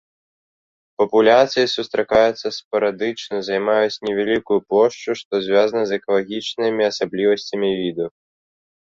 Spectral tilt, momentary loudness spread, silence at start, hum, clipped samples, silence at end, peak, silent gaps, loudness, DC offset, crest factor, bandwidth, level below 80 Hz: -4.5 dB/octave; 9 LU; 1 s; none; under 0.1%; 0.7 s; -2 dBFS; 2.65-2.71 s, 5.25-5.31 s; -19 LUFS; under 0.1%; 18 dB; 7.6 kHz; -58 dBFS